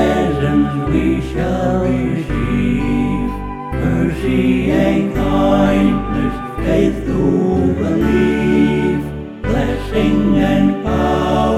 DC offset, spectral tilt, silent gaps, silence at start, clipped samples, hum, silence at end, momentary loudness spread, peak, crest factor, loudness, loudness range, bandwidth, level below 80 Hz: 0.5%; -8 dB/octave; none; 0 s; under 0.1%; none; 0 s; 6 LU; -2 dBFS; 14 dB; -16 LUFS; 2 LU; 13.5 kHz; -26 dBFS